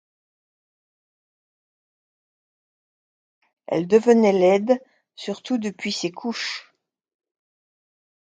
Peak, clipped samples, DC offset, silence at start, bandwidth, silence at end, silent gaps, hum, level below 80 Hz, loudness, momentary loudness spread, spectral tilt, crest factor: -4 dBFS; under 0.1%; under 0.1%; 3.7 s; 9.2 kHz; 1.7 s; none; none; -74 dBFS; -21 LUFS; 16 LU; -5 dB/octave; 22 dB